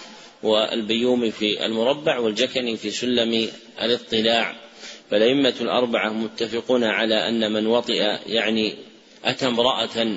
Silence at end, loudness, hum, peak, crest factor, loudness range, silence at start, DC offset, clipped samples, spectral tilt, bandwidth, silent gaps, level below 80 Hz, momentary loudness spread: 0 s; -21 LUFS; none; -4 dBFS; 18 dB; 1 LU; 0 s; under 0.1%; under 0.1%; -4 dB/octave; 8 kHz; none; -64 dBFS; 7 LU